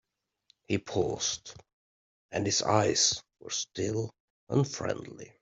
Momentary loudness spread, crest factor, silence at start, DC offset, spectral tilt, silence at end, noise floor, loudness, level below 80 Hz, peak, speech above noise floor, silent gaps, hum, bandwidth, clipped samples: 13 LU; 24 dB; 0.7 s; under 0.1%; -3.5 dB/octave; 0.15 s; -70 dBFS; -30 LUFS; -64 dBFS; -8 dBFS; 40 dB; 1.73-2.29 s, 4.20-4.47 s; none; 8.2 kHz; under 0.1%